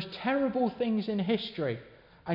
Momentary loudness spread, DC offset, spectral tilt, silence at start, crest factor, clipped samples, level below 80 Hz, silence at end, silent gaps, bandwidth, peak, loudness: 8 LU; under 0.1%; -8.5 dB/octave; 0 s; 14 dB; under 0.1%; -66 dBFS; 0 s; none; 5.6 kHz; -18 dBFS; -30 LUFS